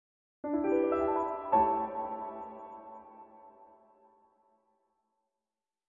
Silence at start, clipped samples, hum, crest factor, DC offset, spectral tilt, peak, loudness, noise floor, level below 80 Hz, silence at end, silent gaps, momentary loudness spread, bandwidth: 0.45 s; under 0.1%; none; 20 dB; under 0.1%; -6.5 dB/octave; -14 dBFS; -31 LUFS; under -90 dBFS; -66 dBFS; 2.25 s; none; 23 LU; 7 kHz